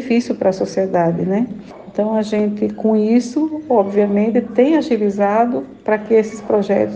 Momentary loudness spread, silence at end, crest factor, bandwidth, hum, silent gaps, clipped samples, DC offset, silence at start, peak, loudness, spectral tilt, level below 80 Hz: 6 LU; 0 s; 14 dB; 8.6 kHz; none; none; under 0.1%; under 0.1%; 0 s; -2 dBFS; -17 LUFS; -7.5 dB/octave; -56 dBFS